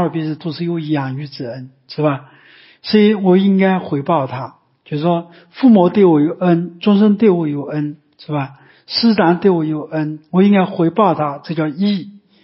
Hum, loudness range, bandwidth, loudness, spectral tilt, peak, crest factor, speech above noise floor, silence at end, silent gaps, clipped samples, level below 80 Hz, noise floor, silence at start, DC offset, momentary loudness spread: none; 3 LU; 5.8 kHz; -15 LUFS; -11.5 dB/octave; 0 dBFS; 14 dB; 31 dB; 0.25 s; none; under 0.1%; -62 dBFS; -46 dBFS; 0 s; under 0.1%; 15 LU